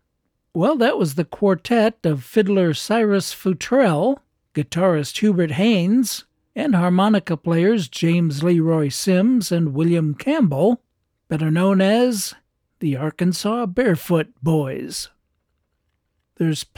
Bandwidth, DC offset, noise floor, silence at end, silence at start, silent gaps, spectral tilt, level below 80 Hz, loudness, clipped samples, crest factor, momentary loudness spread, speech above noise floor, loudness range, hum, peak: 18.5 kHz; under 0.1%; -72 dBFS; 0.15 s; 0.55 s; none; -6 dB/octave; -58 dBFS; -19 LUFS; under 0.1%; 14 dB; 9 LU; 54 dB; 4 LU; none; -6 dBFS